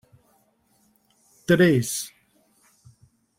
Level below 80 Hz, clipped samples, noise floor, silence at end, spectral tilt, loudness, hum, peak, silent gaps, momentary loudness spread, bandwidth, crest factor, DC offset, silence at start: -62 dBFS; under 0.1%; -65 dBFS; 1.3 s; -5 dB/octave; -21 LUFS; none; -4 dBFS; none; 20 LU; 16.5 kHz; 22 dB; under 0.1%; 1.5 s